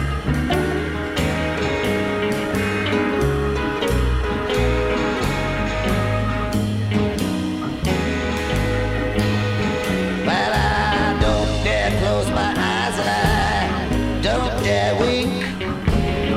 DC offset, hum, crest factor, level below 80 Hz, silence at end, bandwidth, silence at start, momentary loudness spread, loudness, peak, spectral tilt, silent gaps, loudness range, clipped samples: under 0.1%; none; 16 dB; -28 dBFS; 0 s; 16 kHz; 0 s; 4 LU; -20 LUFS; -2 dBFS; -5.5 dB/octave; none; 2 LU; under 0.1%